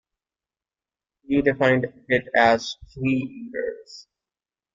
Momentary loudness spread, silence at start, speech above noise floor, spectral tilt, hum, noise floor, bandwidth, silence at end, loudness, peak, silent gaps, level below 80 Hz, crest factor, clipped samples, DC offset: 14 LU; 1.3 s; over 67 dB; -6 dB/octave; none; under -90 dBFS; 7.6 kHz; 0.75 s; -22 LUFS; -4 dBFS; none; -56 dBFS; 22 dB; under 0.1%; under 0.1%